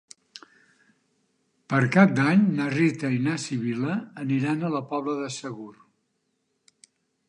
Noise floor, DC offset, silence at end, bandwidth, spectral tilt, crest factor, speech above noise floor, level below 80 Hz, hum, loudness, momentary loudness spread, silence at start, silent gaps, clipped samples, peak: -75 dBFS; under 0.1%; 1.6 s; 10.5 kHz; -6.5 dB/octave; 22 dB; 51 dB; -72 dBFS; none; -24 LUFS; 18 LU; 0.35 s; none; under 0.1%; -4 dBFS